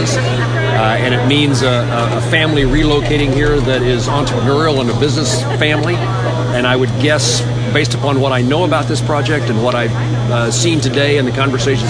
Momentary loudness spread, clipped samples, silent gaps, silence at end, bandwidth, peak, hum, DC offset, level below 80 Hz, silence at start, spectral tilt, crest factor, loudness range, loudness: 3 LU; under 0.1%; none; 0 s; 10.5 kHz; 0 dBFS; none; under 0.1%; -30 dBFS; 0 s; -5 dB/octave; 14 dB; 1 LU; -13 LUFS